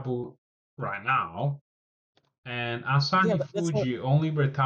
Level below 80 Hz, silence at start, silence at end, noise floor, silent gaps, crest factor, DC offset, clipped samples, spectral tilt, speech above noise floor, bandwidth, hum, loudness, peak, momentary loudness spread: -66 dBFS; 0 s; 0 s; under -90 dBFS; 0.38-0.77 s, 1.61-2.13 s, 2.38-2.43 s; 16 dB; under 0.1%; under 0.1%; -6.5 dB/octave; over 63 dB; 8.6 kHz; none; -27 LUFS; -12 dBFS; 13 LU